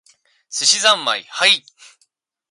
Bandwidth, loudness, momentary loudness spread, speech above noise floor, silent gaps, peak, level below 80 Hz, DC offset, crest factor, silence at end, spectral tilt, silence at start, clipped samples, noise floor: 11.5 kHz; -15 LUFS; 8 LU; 47 dB; none; -2 dBFS; -78 dBFS; under 0.1%; 18 dB; 0.9 s; 1.5 dB/octave; 0.5 s; under 0.1%; -64 dBFS